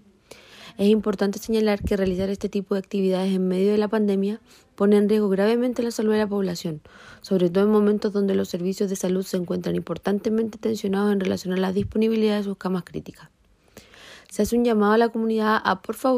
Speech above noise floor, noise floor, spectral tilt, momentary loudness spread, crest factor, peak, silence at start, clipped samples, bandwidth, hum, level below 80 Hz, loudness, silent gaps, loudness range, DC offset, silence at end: 29 dB; -51 dBFS; -6.5 dB/octave; 9 LU; 18 dB; -4 dBFS; 0.55 s; under 0.1%; 15.5 kHz; none; -50 dBFS; -23 LUFS; none; 3 LU; under 0.1%; 0 s